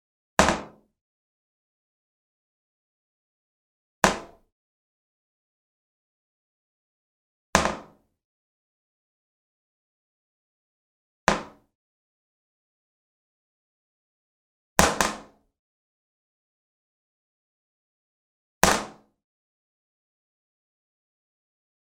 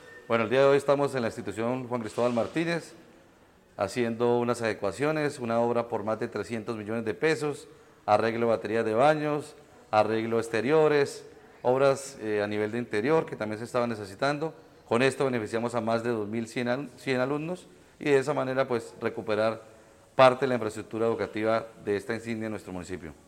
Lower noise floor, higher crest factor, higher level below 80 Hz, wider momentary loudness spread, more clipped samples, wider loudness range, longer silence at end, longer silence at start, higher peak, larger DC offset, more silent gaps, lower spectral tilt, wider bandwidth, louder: second, -48 dBFS vs -58 dBFS; first, 34 dB vs 22 dB; first, -50 dBFS vs -66 dBFS; about the same, 13 LU vs 11 LU; neither; about the same, 5 LU vs 3 LU; first, 2.95 s vs 0.15 s; first, 0.4 s vs 0.05 s; first, 0 dBFS vs -6 dBFS; neither; first, 1.01-4.02 s, 4.52-7.53 s, 8.24-11.27 s, 11.75-14.76 s, 15.59-18.61 s vs none; second, -3 dB/octave vs -6 dB/octave; about the same, 16 kHz vs 15 kHz; first, -24 LUFS vs -28 LUFS